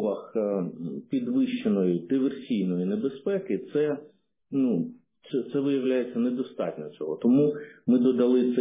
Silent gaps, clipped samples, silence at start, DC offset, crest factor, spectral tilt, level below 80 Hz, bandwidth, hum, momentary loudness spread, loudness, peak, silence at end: none; under 0.1%; 0 s; under 0.1%; 14 dB; -11.5 dB/octave; -74 dBFS; 3.8 kHz; none; 10 LU; -27 LUFS; -12 dBFS; 0 s